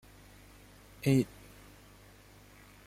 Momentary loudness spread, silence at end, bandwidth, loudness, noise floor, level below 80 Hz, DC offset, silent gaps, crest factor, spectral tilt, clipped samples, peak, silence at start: 27 LU; 1.6 s; 16 kHz; -31 LUFS; -57 dBFS; -60 dBFS; under 0.1%; none; 20 dB; -7 dB/octave; under 0.1%; -16 dBFS; 1.05 s